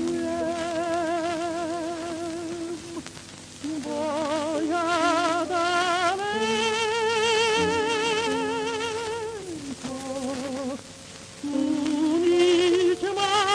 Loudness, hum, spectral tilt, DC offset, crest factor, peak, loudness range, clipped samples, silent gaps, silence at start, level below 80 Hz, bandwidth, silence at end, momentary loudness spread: -25 LUFS; none; -3.5 dB/octave; under 0.1%; 16 dB; -10 dBFS; 7 LU; under 0.1%; none; 0 s; -60 dBFS; 11 kHz; 0 s; 14 LU